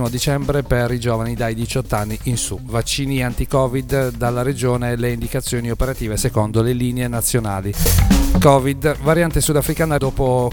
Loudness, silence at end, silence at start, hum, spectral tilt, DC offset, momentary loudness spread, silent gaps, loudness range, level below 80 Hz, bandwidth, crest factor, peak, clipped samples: -18 LUFS; 0 s; 0 s; none; -5.5 dB/octave; under 0.1%; 7 LU; none; 4 LU; -26 dBFS; 19 kHz; 18 dB; 0 dBFS; under 0.1%